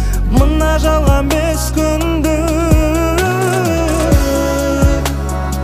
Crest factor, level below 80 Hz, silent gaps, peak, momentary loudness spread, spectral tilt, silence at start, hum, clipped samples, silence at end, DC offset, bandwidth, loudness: 12 dB; -16 dBFS; none; 0 dBFS; 3 LU; -5.5 dB/octave; 0 s; none; under 0.1%; 0 s; under 0.1%; 15.5 kHz; -14 LUFS